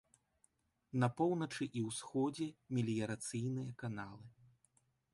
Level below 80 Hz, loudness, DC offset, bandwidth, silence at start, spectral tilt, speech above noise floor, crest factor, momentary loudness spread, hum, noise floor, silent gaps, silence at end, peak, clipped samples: -76 dBFS; -40 LUFS; under 0.1%; 11.5 kHz; 0.95 s; -6 dB/octave; 39 dB; 20 dB; 9 LU; none; -78 dBFS; none; 0.85 s; -20 dBFS; under 0.1%